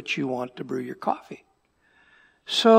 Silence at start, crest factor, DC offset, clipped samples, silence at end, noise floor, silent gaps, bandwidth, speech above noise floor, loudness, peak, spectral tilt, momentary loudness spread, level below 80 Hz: 0 s; 22 dB; under 0.1%; under 0.1%; 0 s; -65 dBFS; none; 15.5 kHz; 42 dB; -28 LUFS; -4 dBFS; -4.5 dB/octave; 19 LU; -76 dBFS